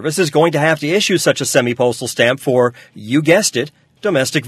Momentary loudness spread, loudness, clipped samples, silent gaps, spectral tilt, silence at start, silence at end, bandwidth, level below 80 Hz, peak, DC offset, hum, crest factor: 6 LU; -15 LUFS; under 0.1%; none; -4 dB/octave; 0 s; 0 s; 13.5 kHz; -60 dBFS; 0 dBFS; under 0.1%; none; 16 dB